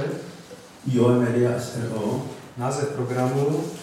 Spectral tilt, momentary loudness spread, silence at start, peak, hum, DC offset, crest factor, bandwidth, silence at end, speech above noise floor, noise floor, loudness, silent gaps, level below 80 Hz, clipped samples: -7 dB/octave; 16 LU; 0 s; -8 dBFS; none; under 0.1%; 16 dB; 15 kHz; 0 s; 21 dB; -43 dBFS; -24 LUFS; none; -64 dBFS; under 0.1%